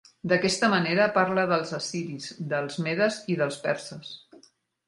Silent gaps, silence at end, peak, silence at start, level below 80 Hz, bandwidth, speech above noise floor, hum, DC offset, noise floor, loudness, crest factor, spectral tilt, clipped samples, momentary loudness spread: none; 0.7 s; -8 dBFS; 0.25 s; -66 dBFS; 11.5 kHz; 34 dB; none; under 0.1%; -60 dBFS; -26 LUFS; 20 dB; -4.5 dB/octave; under 0.1%; 13 LU